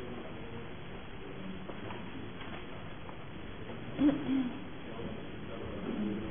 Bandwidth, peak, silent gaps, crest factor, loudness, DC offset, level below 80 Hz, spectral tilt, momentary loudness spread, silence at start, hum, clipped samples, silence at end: 3.6 kHz; -16 dBFS; none; 22 dB; -39 LUFS; 0.5%; -56 dBFS; -5.5 dB/octave; 15 LU; 0 s; none; under 0.1%; 0 s